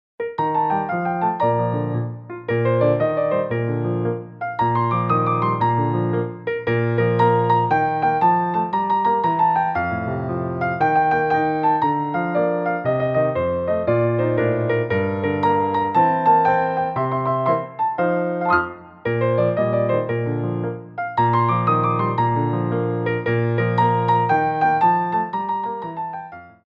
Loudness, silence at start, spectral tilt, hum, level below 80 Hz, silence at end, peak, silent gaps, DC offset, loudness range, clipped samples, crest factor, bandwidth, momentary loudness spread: -20 LUFS; 0.2 s; -9.5 dB/octave; none; -54 dBFS; 0.15 s; -4 dBFS; none; under 0.1%; 2 LU; under 0.1%; 14 dB; 5.2 kHz; 7 LU